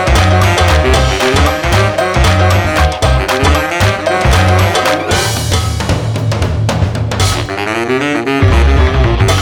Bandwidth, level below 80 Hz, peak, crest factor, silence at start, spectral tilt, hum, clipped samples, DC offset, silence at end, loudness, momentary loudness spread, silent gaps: 19.5 kHz; -18 dBFS; 0 dBFS; 10 dB; 0 s; -5 dB/octave; none; under 0.1%; 0.3%; 0 s; -11 LUFS; 5 LU; none